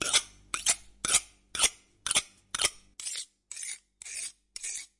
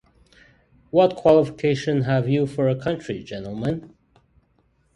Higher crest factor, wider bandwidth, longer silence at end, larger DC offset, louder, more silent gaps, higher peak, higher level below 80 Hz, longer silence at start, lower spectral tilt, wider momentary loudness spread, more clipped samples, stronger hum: first, 26 dB vs 20 dB; about the same, 11.5 kHz vs 11 kHz; second, 0.15 s vs 1.1 s; neither; second, -30 LUFS vs -22 LUFS; neither; second, -8 dBFS vs -2 dBFS; second, -60 dBFS vs -54 dBFS; second, 0 s vs 0.95 s; second, 1.5 dB/octave vs -7.5 dB/octave; about the same, 13 LU vs 14 LU; neither; neither